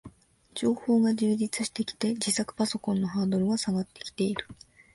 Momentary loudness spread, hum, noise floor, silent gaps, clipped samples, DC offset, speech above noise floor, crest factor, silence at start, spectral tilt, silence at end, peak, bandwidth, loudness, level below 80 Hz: 8 LU; none; -53 dBFS; none; under 0.1%; under 0.1%; 25 dB; 16 dB; 0.05 s; -5 dB/octave; 0.4 s; -12 dBFS; 11.5 kHz; -28 LUFS; -62 dBFS